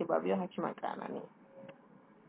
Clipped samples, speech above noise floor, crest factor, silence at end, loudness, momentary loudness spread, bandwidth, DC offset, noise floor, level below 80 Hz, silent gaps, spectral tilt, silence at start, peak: under 0.1%; 24 dB; 20 dB; 0.15 s; -37 LUFS; 22 LU; 4 kHz; under 0.1%; -61 dBFS; -84 dBFS; none; -6 dB/octave; 0 s; -18 dBFS